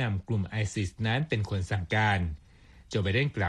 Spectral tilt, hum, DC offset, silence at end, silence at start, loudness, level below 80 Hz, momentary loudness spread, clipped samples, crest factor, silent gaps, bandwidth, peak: -6 dB/octave; none; under 0.1%; 0 s; 0 s; -30 LUFS; -48 dBFS; 6 LU; under 0.1%; 18 dB; none; 10.5 kHz; -12 dBFS